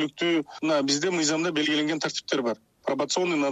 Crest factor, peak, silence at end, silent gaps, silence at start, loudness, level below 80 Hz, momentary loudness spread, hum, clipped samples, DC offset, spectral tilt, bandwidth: 20 dB; -6 dBFS; 0 s; none; 0 s; -26 LUFS; -72 dBFS; 6 LU; none; under 0.1%; under 0.1%; -3 dB/octave; 10.5 kHz